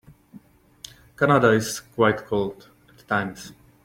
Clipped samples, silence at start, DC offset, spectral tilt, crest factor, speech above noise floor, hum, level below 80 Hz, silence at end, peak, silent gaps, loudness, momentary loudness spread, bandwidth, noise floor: under 0.1%; 0.35 s; under 0.1%; -5.5 dB/octave; 20 dB; 28 dB; none; -56 dBFS; 0.3 s; -4 dBFS; none; -22 LUFS; 25 LU; 16.5 kHz; -50 dBFS